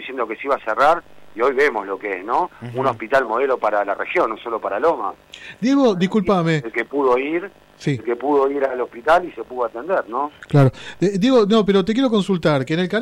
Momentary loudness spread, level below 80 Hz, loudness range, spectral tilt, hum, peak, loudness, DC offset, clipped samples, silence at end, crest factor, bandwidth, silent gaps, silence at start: 9 LU; -52 dBFS; 3 LU; -7 dB/octave; none; -6 dBFS; -19 LUFS; under 0.1%; under 0.1%; 0 s; 14 dB; 12.5 kHz; none; 0 s